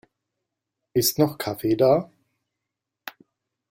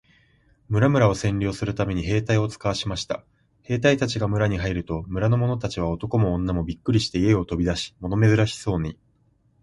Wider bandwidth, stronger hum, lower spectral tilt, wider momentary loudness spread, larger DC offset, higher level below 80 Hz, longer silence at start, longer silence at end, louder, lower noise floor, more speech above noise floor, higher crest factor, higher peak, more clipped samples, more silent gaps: first, 16.5 kHz vs 11.5 kHz; neither; second, -5 dB/octave vs -6.5 dB/octave; first, 22 LU vs 9 LU; neither; second, -60 dBFS vs -40 dBFS; first, 0.95 s vs 0.7 s; about the same, 0.6 s vs 0.7 s; about the same, -22 LUFS vs -23 LUFS; first, -85 dBFS vs -63 dBFS; first, 63 dB vs 41 dB; about the same, 20 dB vs 18 dB; about the same, -6 dBFS vs -4 dBFS; neither; neither